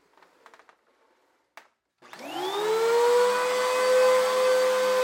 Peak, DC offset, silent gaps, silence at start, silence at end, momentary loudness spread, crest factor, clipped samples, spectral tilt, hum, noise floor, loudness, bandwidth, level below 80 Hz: -12 dBFS; under 0.1%; none; 2.15 s; 0 s; 11 LU; 14 dB; under 0.1%; -1 dB/octave; none; -68 dBFS; -23 LUFS; 17 kHz; -86 dBFS